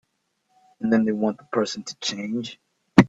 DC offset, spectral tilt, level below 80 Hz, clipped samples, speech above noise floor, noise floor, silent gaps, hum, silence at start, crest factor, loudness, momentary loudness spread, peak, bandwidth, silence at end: under 0.1%; -5.5 dB/octave; -58 dBFS; under 0.1%; 47 dB; -72 dBFS; none; none; 0.8 s; 24 dB; -25 LUFS; 10 LU; 0 dBFS; 9.8 kHz; 0 s